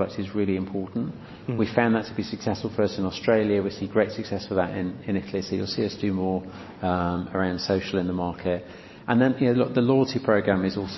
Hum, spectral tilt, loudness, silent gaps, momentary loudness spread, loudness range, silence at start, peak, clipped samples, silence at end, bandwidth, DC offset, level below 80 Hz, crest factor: none; -7 dB/octave; -25 LUFS; none; 10 LU; 4 LU; 0 s; -4 dBFS; under 0.1%; 0 s; 6.2 kHz; under 0.1%; -48 dBFS; 22 dB